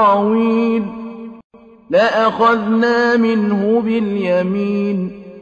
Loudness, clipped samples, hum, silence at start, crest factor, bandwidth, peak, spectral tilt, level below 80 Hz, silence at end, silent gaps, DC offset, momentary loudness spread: -15 LUFS; under 0.1%; none; 0 s; 12 dB; 7.2 kHz; -2 dBFS; -7.5 dB/octave; -56 dBFS; 0 s; 1.44-1.50 s; under 0.1%; 13 LU